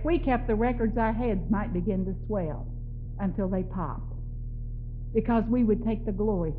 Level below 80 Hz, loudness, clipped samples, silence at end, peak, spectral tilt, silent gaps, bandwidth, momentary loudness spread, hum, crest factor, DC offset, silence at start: -34 dBFS; -29 LUFS; under 0.1%; 0 s; -12 dBFS; -8.5 dB/octave; none; 4.3 kHz; 13 LU; none; 14 dB; under 0.1%; 0 s